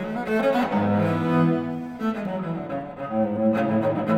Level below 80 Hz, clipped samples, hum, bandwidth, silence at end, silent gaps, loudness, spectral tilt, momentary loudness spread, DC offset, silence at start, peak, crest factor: -56 dBFS; under 0.1%; none; 13.5 kHz; 0 s; none; -24 LUFS; -8.5 dB/octave; 8 LU; under 0.1%; 0 s; -10 dBFS; 14 dB